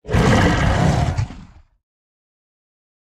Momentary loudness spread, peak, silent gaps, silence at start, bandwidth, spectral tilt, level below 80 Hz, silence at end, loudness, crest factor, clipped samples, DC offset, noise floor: 11 LU; -2 dBFS; none; 0.05 s; 13.5 kHz; -6 dB/octave; -28 dBFS; 1.75 s; -17 LUFS; 18 dB; under 0.1%; under 0.1%; -42 dBFS